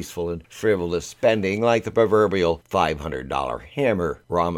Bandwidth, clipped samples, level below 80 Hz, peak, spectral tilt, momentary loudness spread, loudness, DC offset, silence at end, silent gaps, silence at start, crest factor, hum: 16 kHz; under 0.1%; -46 dBFS; -4 dBFS; -5.5 dB/octave; 10 LU; -22 LUFS; under 0.1%; 0 s; none; 0 s; 18 dB; none